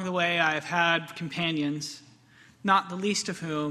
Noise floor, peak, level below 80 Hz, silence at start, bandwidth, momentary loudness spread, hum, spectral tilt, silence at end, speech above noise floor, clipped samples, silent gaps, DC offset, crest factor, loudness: -57 dBFS; -8 dBFS; -70 dBFS; 0 s; 13.5 kHz; 11 LU; none; -4 dB/octave; 0 s; 29 dB; under 0.1%; none; under 0.1%; 20 dB; -27 LUFS